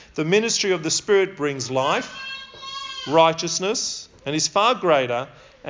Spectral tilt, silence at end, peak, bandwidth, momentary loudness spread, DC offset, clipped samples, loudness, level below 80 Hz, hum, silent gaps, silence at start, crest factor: -3 dB/octave; 0 s; -2 dBFS; 7.8 kHz; 14 LU; under 0.1%; under 0.1%; -21 LUFS; -60 dBFS; none; none; 0 s; 20 dB